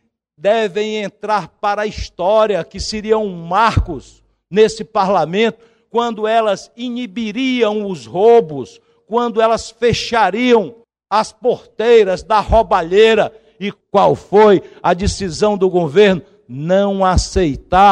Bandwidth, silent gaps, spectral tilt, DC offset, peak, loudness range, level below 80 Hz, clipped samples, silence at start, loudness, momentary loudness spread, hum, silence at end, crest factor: 10 kHz; none; -5.5 dB/octave; under 0.1%; -2 dBFS; 4 LU; -32 dBFS; under 0.1%; 0.45 s; -15 LUFS; 12 LU; none; 0 s; 14 dB